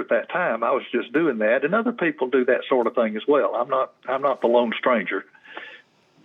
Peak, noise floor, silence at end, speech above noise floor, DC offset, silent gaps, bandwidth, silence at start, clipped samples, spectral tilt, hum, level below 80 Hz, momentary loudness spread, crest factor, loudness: -6 dBFS; -53 dBFS; 0.45 s; 31 dB; under 0.1%; none; 4.1 kHz; 0 s; under 0.1%; -7.5 dB/octave; none; under -90 dBFS; 9 LU; 16 dB; -22 LUFS